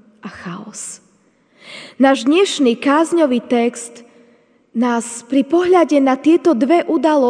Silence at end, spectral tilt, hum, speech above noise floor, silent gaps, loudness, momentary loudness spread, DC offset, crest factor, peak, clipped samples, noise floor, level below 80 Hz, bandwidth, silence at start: 0 s; -4 dB/octave; none; 41 dB; none; -15 LUFS; 18 LU; under 0.1%; 16 dB; 0 dBFS; under 0.1%; -56 dBFS; -66 dBFS; 10 kHz; 0.25 s